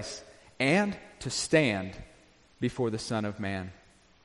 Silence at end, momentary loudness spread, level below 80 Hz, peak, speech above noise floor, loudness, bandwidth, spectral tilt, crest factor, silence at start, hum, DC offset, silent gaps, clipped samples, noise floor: 0.5 s; 16 LU; -58 dBFS; -10 dBFS; 30 dB; -30 LUFS; 11.5 kHz; -4.5 dB/octave; 22 dB; 0 s; none; under 0.1%; none; under 0.1%; -59 dBFS